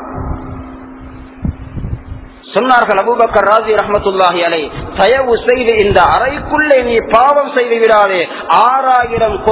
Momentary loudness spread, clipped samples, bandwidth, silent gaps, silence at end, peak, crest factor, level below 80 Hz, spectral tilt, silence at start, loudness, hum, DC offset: 16 LU; 0.5%; 4 kHz; none; 0 s; 0 dBFS; 12 dB; -32 dBFS; -9 dB/octave; 0 s; -11 LUFS; none; under 0.1%